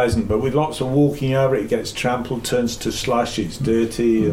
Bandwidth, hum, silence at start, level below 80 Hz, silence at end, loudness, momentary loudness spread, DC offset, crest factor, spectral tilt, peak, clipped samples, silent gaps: 16.5 kHz; none; 0 s; -38 dBFS; 0 s; -20 LUFS; 5 LU; under 0.1%; 14 dB; -5.5 dB/octave; -6 dBFS; under 0.1%; none